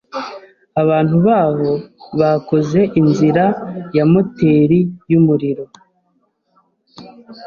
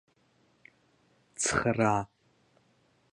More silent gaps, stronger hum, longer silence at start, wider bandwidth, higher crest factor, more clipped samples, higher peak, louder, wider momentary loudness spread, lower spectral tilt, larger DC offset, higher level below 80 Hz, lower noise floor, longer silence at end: neither; neither; second, 0.15 s vs 1.4 s; second, 7 kHz vs 11.5 kHz; second, 14 dB vs 24 dB; neither; first, 0 dBFS vs -10 dBFS; first, -15 LUFS vs -29 LUFS; second, 12 LU vs 19 LU; first, -9 dB/octave vs -4 dB/octave; neither; first, -52 dBFS vs -58 dBFS; second, -63 dBFS vs -68 dBFS; second, 0 s vs 1.05 s